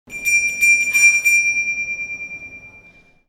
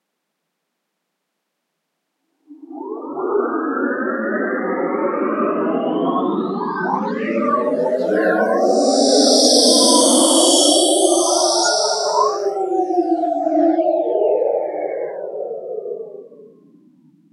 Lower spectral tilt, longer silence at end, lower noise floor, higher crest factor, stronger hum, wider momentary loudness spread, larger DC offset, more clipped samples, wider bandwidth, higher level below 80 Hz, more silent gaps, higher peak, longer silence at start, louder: second, 2 dB/octave vs -2 dB/octave; second, 0.5 s vs 0.85 s; second, -49 dBFS vs -76 dBFS; about the same, 16 dB vs 18 dB; neither; about the same, 18 LU vs 16 LU; neither; neither; first, 18 kHz vs 13 kHz; first, -56 dBFS vs under -90 dBFS; neither; about the same, -2 dBFS vs 0 dBFS; second, 0.1 s vs 2.5 s; about the same, -14 LUFS vs -16 LUFS